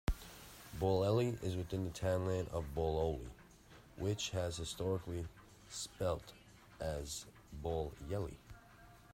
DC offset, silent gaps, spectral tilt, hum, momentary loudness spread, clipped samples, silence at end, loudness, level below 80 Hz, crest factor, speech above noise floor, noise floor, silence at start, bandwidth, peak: under 0.1%; none; -5.5 dB/octave; none; 23 LU; under 0.1%; 0.1 s; -40 LUFS; -52 dBFS; 18 dB; 22 dB; -61 dBFS; 0.1 s; 16 kHz; -22 dBFS